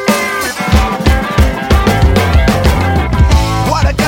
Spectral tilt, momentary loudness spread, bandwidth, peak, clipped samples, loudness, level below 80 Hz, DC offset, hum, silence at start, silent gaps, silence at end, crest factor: -5.5 dB/octave; 3 LU; 17 kHz; 0 dBFS; under 0.1%; -11 LUFS; -14 dBFS; under 0.1%; none; 0 s; none; 0 s; 10 dB